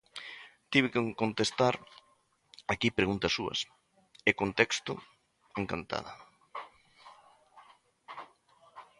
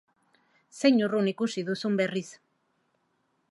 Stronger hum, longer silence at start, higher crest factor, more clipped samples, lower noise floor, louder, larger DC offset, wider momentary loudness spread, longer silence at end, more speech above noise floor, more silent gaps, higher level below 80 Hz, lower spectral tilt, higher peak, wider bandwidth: neither; second, 0.15 s vs 0.75 s; first, 28 dB vs 20 dB; neither; second, -70 dBFS vs -74 dBFS; second, -31 LUFS vs -27 LUFS; neither; first, 20 LU vs 9 LU; second, 0.15 s vs 1.15 s; second, 39 dB vs 47 dB; neither; first, -62 dBFS vs -82 dBFS; second, -4 dB/octave vs -5.5 dB/octave; about the same, -8 dBFS vs -8 dBFS; about the same, 11.5 kHz vs 11.5 kHz